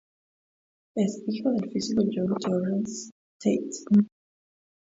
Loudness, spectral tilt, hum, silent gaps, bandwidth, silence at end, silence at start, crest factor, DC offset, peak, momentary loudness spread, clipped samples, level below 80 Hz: -27 LUFS; -6.5 dB/octave; none; 3.12-3.40 s; 7.8 kHz; 0.8 s; 0.95 s; 18 dB; under 0.1%; -10 dBFS; 11 LU; under 0.1%; -68 dBFS